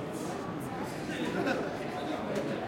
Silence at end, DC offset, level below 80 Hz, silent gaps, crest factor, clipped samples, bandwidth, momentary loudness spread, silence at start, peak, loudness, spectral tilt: 0 s; under 0.1%; -62 dBFS; none; 16 dB; under 0.1%; 16.5 kHz; 5 LU; 0 s; -18 dBFS; -35 LUFS; -5.5 dB/octave